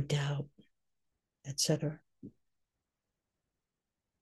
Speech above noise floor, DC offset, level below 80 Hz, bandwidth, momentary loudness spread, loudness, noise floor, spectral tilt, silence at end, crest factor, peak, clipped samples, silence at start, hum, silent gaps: 55 dB; under 0.1%; -72 dBFS; 12 kHz; 24 LU; -35 LUFS; -89 dBFS; -4.5 dB/octave; 1.95 s; 22 dB; -18 dBFS; under 0.1%; 0 s; none; none